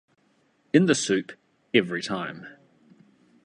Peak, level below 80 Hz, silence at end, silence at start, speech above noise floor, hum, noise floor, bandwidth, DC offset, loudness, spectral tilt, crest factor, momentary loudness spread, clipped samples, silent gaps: -4 dBFS; -68 dBFS; 0.95 s; 0.75 s; 42 dB; none; -66 dBFS; 11 kHz; under 0.1%; -24 LUFS; -4.5 dB/octave; 22 dB; 22 LU; under 0.1%; none